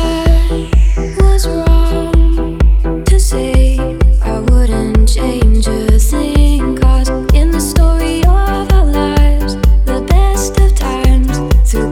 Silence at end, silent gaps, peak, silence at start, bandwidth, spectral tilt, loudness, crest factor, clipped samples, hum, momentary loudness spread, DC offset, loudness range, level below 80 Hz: 0 s; none; 0 dBFS; 0 s; 14.5 kHz; -6 dB/octave; -12 LUFS; 10 dB; under 0.1%; none; 2 LU; under 0.1%; 1 LU; -10 dBFS